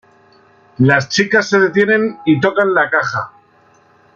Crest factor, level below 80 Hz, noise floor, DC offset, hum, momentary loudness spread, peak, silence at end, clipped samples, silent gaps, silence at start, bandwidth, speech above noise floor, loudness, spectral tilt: 14 dB; -58 dBFS; -51 dBFS; under 0.1%; none; 6 LU; -2 dBFS; 0.85 s; under 0.1%; none; 0.8 s; 7.4 kHz; 37 dB; -14 LUFS; -5.5 dB/octave